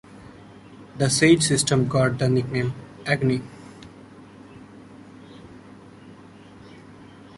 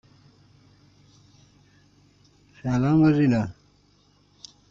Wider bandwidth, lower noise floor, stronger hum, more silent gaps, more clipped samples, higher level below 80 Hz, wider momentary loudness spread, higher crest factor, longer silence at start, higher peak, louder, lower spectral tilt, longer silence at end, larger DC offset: first, 11.5 kHz vs 7.4 kHz; second, -46 dBFS vs -61 dBFS; neither; neither; neither; about the same, -54 dBFS vs -56 dBFS; about the same, 28 LU vs 28 LU; about the same, 22 dB vs 18 dB; second, 0.15 s vs 2.65 s; first, -4 dBFS vs -8 dBFS; about the same, -21 LUFS vs -22 LUFS; second, -4.5 dB/octave vs -8.5 dB/octave; second, 0.35 s vs 1.2 s; neither